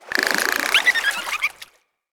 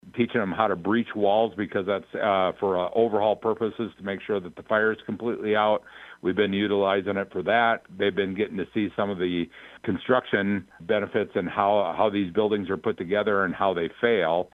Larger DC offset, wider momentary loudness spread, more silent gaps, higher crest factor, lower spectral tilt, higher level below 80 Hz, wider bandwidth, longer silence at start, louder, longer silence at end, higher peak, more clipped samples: neither; about the same, 8 LU vs 8 LU; neither; about the same, 22 dB vs 20 dB; second, 0.5 dB/octave vs -8 dB/octave; about the same, -62 dBFS vs -64 dBFS; first, over 20 kHz vs 5.2 kHz; about the same, 0.05 s vs 0.05 s; first, -19 LUFS vs -25 LUFS; first, 0.5 s vs 0.1 s; first, -2 dBFS vs -6 dBFS; neither